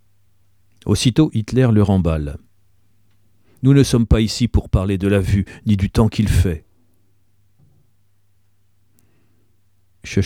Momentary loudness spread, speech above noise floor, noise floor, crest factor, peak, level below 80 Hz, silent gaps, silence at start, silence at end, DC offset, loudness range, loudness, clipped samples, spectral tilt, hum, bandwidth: 10 LU; 48 dB; -63 dBFS; 18 dB; -2 dBFS; -30 dBFS; none; 0.85 s; 0 s; 0.2%; 6 LU; -17 LUFS; under 0.1%; -6.5 dB/octave; none; 15.5 kHz